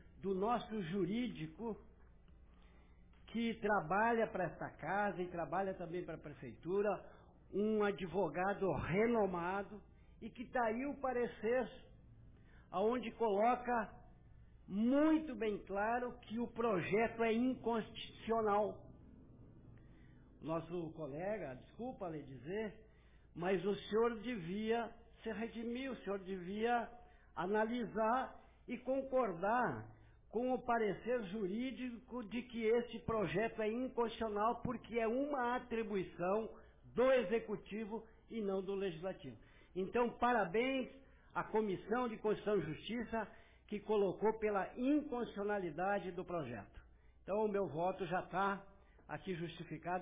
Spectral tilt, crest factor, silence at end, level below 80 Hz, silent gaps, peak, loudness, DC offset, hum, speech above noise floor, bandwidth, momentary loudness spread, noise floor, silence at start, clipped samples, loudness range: -5 dB/octave; 14 dB; 0 s; -64 dBFS; none; -24 dBFS; -39 LUFS; under 0.1%; none; 26 dB; 3.8 kHz; 13 LU; -64 dBFS; 0.15 s; under 0.1%; 4 LU